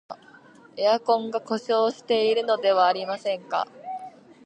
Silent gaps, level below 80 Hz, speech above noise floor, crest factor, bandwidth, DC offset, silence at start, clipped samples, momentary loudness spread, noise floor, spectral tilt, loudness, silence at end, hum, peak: none; -82 dBFS; 28 dB; 18 dB; 9.2 kHz; under 0.1%; 0.1 s; under 0.1%; 18 LU; -51 dBFS; -4 dB/octave; -24 LUFS; 0.35 s; none; -8 dBFS